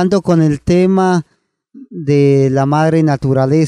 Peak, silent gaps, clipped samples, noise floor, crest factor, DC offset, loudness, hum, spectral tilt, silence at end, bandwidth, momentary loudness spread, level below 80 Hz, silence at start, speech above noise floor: 0 dBFS; none; under 0.1%; -45 dBFS; 12 dB; under 0.1%; -13 LUFS; none; -8 dB/octave; 0 s; 10.5 kHz; 5 LU; -42 dBFS; 0 s; 33 dB